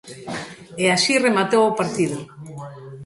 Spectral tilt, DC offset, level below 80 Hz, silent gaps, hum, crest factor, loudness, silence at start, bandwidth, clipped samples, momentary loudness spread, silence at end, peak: -4 dB/octave; under 0.1%; -62 dBFS; none; none; 18 dB; -19 LUFS; 0.05 s; 11.5 kHz; under 0.1%; 20 LU; 0 s; -4 dBFS